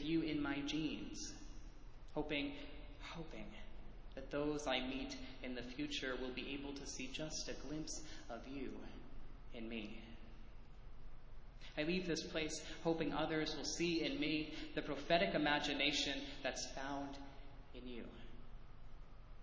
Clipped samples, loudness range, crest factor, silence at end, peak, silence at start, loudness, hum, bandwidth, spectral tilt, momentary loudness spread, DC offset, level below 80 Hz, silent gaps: under 0.1%; 11 LU; 24 dB; 0 s; -20 dBFS; 0 s; -42 LUFS; none; 8 kHz; -4 dB/octave; 23 LU; under 0.1%; -56 dBFS; none